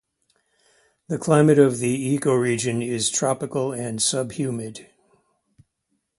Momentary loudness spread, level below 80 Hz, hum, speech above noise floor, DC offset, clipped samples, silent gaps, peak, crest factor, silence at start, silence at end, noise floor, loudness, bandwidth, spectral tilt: 13 LU; -62 dBFS; none; 54 dB; under 0.1%; under 0.1%; none; -2 dBFS; 20 dB; 1.1 s; 1.35 s; -75 dBFS; -21 LUFS; 11.5 kHz; -5 dB/octave